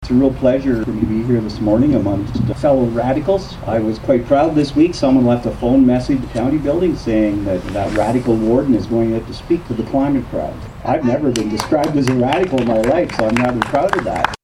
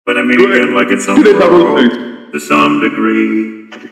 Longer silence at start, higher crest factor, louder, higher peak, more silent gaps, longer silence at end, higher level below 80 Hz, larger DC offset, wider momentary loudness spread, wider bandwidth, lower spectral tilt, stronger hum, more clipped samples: about the same, 0 s vs 0.05 s; first, 16 dB vs 10 dB; second, -16 LUFS vs -9 LUFS; about the same, 0 dBFS vs 0 dBFS; neither; about the same, 0.1 s vs 0.05 s; first, -34 dBFS vs -52 dBFS; neither; second, 6 LU vs 15 LU; about the same, 13 kHz vs 13.5 kHz; first, -7 dB/octave vs -5 dB/octave; neither; second, under 0.1% vs 0.6%